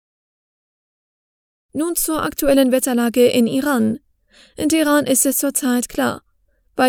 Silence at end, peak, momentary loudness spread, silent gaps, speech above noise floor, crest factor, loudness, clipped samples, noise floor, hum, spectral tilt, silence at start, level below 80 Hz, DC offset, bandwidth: 0 s; -2 dBFS; 10 LU; none; 44 dB; 18 dB; -17 LUFS; under 0.1%; -61 dBFS; none; -3 dB/octave; 1.75 s; -48 dBFS; under 0.1%; over 20 kHz